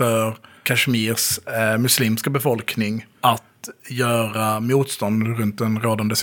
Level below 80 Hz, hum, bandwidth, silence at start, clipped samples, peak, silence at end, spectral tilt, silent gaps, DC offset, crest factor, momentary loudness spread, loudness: -64 dBFS; none; 19 kHz; 0 s; under 0.1%; -2 dBFS; 0 s; -4 dB/octave; none; under 0.1%; 18 dB; 8 LU; -20 LUFS